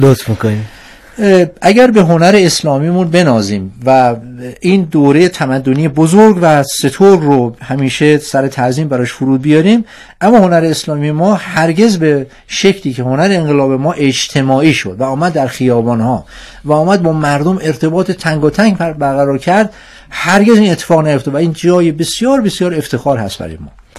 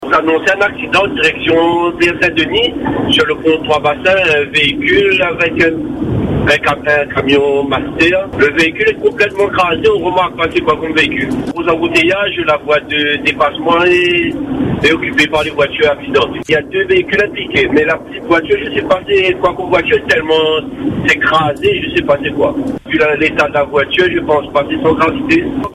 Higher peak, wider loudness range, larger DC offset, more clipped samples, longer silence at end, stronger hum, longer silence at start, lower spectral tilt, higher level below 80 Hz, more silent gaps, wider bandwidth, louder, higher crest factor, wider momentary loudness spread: about the same, 0 dBFS vs 0 dBFS; about the same, 3 LU vs 2 LU; neither; first, 2% vs under 0.1%; about the same, 0 s vs 0 s; neither; about the same, 0 s vs 0 s; about the same, -6 dB/octave vs -5 dB/octave; about the same, -42 dBFS vs -38 dBFS; neither; about the same, 14 kHz vs 13 kHz; about the same, -11 LUFS vs -12 LUFS; about the same, 10 dB vs 12 dB; first, 9 LU vs 4 LU